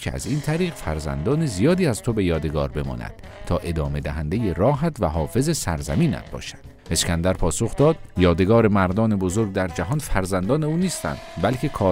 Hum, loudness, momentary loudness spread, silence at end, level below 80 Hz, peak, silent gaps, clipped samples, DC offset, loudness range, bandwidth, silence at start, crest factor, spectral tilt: none; -22 LUFS; 9 LU; 0 s; -34 dBFS; -4 dBFS; none; under 0.1%; under 0.1%; 4 LU; 16 kHz; 0 s; 16 dB; -6 dB/octave